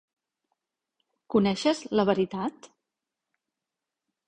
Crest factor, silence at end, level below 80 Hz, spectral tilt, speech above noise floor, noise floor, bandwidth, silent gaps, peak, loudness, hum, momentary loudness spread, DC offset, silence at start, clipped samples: 22 dB; 1.6 s; -64 dBFS; -6 dB/octave; 62 dB; -88 dBFS; 9.6 kHz; none; -8 dBFS; -26 LUFS; none; 8 LU; under 0.1%; 1.3 s; under 0.1%